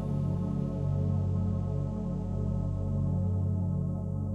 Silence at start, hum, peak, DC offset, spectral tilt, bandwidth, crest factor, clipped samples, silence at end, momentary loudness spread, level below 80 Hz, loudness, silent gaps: 0 s; none; -20 dBFS; under 0.1%; -11 dB/octave; 3.1 kHz; 10 dB; under 0.1%; 0 s; 3 LU; -42 dBFS; -31 LUFS; none